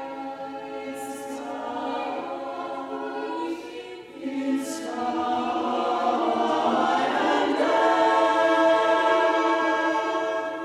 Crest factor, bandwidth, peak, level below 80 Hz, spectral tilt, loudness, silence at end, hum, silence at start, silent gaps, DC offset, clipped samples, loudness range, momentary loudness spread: 16 dB; 14 kHz; -8 dBFS; -70 dBFS; -3.5 dB/octave; -24 LUFS; 0 s; none; 0 s; none; under 0.1%; under 0.1%; 11 LU; 14 LU